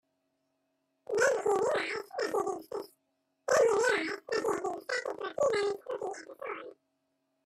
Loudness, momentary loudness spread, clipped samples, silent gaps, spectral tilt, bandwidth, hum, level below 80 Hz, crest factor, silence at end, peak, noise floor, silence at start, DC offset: -31 LUFS; 15 LU; under 0.1%; none; -2.5 dB/octave; 14 kHz; none; -76 dBFS; 18 dB; 0.75 s; -14 dBFS; -79 dBFS; 1.1 s; under 0.1%